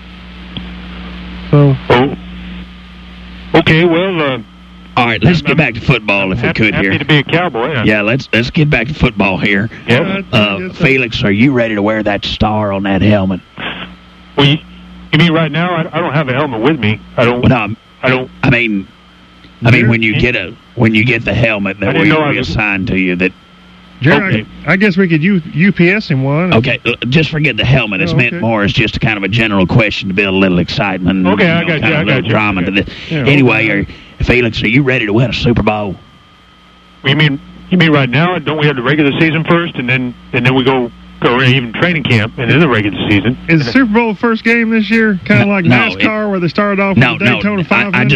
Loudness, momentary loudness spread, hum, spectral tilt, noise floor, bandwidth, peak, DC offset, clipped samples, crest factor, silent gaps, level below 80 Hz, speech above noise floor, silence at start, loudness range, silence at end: -11 LUFS; 7 LU; none; -7 dB/octave; -42 dBFS; 8.2 kHz; 0 dBFS; under 0.1%; under 0.1%; 12 dB; none; -34 dBFS; 31 dB; 0 s; 3 LU; 0 s